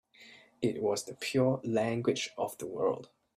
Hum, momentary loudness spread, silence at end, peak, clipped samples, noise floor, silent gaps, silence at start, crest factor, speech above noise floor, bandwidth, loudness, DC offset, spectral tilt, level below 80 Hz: none; 7 LU; 0.3 s; -16 dBFS; under 0.1%; -57 dBFS; none; 0.2 s; 18 dB; 25 dB; 15.5 kHz; -33 LUFS; under 0.1%; -5 dB/octave; -72 dBFS